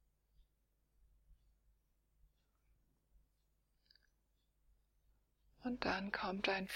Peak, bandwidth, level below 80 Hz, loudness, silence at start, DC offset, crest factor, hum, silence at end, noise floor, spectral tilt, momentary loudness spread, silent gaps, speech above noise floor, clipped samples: -20 dBFS; 16.5 kHz; -70 dBFS; -41 LUFS; 1.3 s; under 0.1%; 28 dB; none; 0 s; -81 dBFS; -4.5 dB/octave; 8 LU; none; 40 dB; under 0.1%